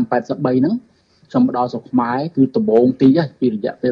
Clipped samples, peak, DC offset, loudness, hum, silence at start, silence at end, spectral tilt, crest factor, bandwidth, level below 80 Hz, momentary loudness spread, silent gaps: under 0.1%; -2 dBFS; under 0.1%; -17 LUFS; none; 0 s; 0 s; -9 dB/octave; 14 dB; 6.2 kHz; -58 dBFS; 7 LU; none